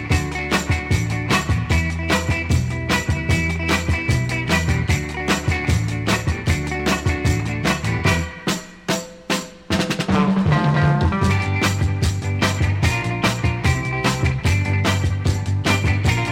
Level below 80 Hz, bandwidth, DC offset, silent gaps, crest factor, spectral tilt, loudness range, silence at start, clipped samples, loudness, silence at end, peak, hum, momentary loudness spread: -30 dBFS; 16.5 kHz; under 0.1%; none; 16 dB; -5 dB/octave; 2 LU; 0 s; under 0.1%; -20 LUFS; 0 s; -4 dBFS; none; 4 LU